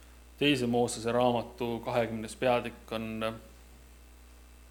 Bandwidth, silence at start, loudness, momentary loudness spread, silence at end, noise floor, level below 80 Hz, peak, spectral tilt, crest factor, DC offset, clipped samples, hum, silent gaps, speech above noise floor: 19 kHz; 0 s; -31 LUFS; 9 LU; 0 s; -53 dBFS; -54 dBFS; -12 dBFS; -5 dB/octave; 20 dB; under 0.1%; under 0.1%; 60 Hz at -50 dBFS; none; 23 dB